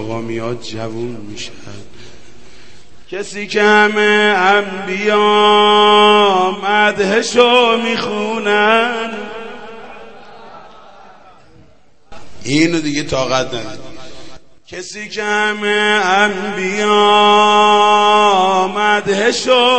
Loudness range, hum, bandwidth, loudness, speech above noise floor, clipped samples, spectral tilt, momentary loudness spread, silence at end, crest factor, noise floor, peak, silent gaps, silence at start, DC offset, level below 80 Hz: 11 LU; none; 8.8 kHz; -12 LUFS; 37 dB; under 0.1%; -3.5 dB/octave; 19 LU; 0 s; 14 dB; -51 dBFS; 0 dBFS; none; 0 s; 2%; -52 dBFS